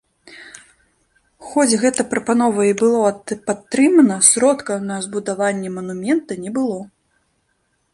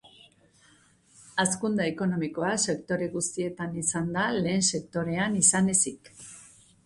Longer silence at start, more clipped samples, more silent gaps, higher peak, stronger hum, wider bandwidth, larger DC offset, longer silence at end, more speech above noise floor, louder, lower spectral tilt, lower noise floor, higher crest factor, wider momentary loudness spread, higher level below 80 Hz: second, 0.3 s vs 1.2 s; neither; neither; first, 0 dBFS vs -6 dBFS; neither; about the same, 11.5 kHz vs 11.5 kHz; neither; first, 1.1 s vs 0.4 s; first, 49 dB vs 33 dB; first, -17 LUFS vs -26 LUFS; about the same, -3.5 dB/octave vs -3.5 dB/octave; first, -67 dBFS vs -61 dBFS; second, 18 dB vs 24 dB; first, 14 LU vs 11 LU; about the same, -62 dBFS vs -62 dBFS